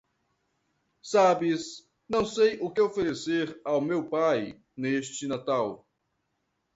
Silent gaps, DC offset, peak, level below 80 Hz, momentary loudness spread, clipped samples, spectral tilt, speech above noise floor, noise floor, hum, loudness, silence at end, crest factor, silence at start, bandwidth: none; under 0.1%; -10 dBFS; -64 dBFS; 12 LU; under 0.1%; -5 dB/octave; 51 dB; -78 dBFS; none; -27 LUFS; 1 s; 18 dB; 1.05 s; 8 kHz